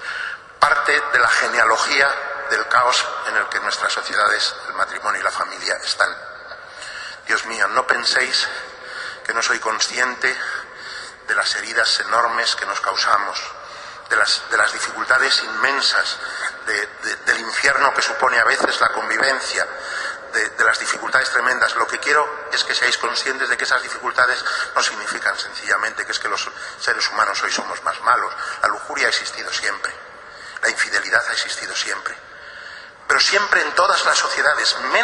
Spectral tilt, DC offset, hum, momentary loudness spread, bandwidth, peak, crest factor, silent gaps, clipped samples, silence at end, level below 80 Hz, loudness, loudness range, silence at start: 0.5 dB/octave; under 0.1%; none; 13 LU; 11.5 kHz; 0 dBFS; 20 dB; none; under 0.1%; 0 s; -58 dBFS; -18 LUFS; 4 LU; 0 s